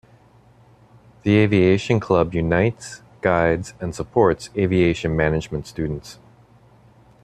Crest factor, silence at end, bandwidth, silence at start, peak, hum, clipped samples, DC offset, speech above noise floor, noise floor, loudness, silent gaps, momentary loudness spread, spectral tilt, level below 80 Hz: 18 dB; 1.1 s; 12.5 kHz; 1.25 s; -2 dBFS; none; under 0.1%; under 0.1%; 33 dB; -52 dBFS; -20 LUFS; none; 13 LU; -7 dB/octave; -44 dBFS